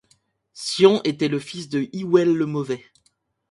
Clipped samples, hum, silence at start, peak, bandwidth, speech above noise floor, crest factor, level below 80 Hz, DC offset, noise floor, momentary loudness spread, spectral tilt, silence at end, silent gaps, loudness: under 0.1%; none; 0.55 s; -2 dBFS; 11.5 kHz; 46 dB; 20 dB; -68 dBFS; under 0.1%; -67 dBFS; 13 LU; -5.5 dB/octave; 0.75 s; none; -21 LUFS